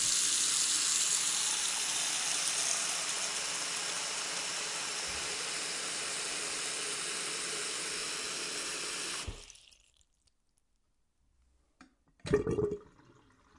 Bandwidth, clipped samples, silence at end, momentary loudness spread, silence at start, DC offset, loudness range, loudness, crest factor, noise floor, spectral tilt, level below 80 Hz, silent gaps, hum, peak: 11.5 kHz; under 0.1%; 0.75 s; 8 LU; 0 s; under 0.1%; 11 LU; -32 LUFS; 22 dB; -75 dBFS; -0.5 dB/octave; -60 dBFS; none; none; -14 dBFS